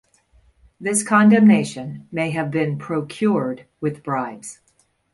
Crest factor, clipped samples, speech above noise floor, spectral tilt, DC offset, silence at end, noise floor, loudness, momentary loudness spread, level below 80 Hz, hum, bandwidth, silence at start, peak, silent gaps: 16 dB; under 0.1%; 38 dB; -5.5 dB/octave; under 0.1%; 0.6 s; -57 dBFS; -19 LUFS; 16 LU; -60 dBFS; none; 11.5 kHz; 0.8 s; -4 dBFS; none